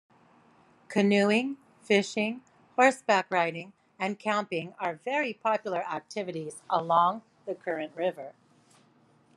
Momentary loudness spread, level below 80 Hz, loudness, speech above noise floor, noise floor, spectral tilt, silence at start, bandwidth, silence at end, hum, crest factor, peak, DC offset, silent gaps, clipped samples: 15 LU; -82 dBFS; -28 LUFS; 35 dB; -63 dBFS; -5 dB/octave; 0.9 s; 11.5 kHz; 1.05 s; none; 22 dB; -6 dBFS; under 0.1%; none; under 0.1%